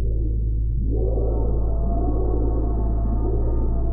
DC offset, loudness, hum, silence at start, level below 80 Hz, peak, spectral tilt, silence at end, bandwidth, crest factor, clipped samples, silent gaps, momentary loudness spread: under 0.1%; -24 LUFS; none; 0 s; -22 dBFS; -10 dBFS; -16 dB/octave; 0 s; 1.4 kHz; 10 dB; under 0.1%; none; 1 LU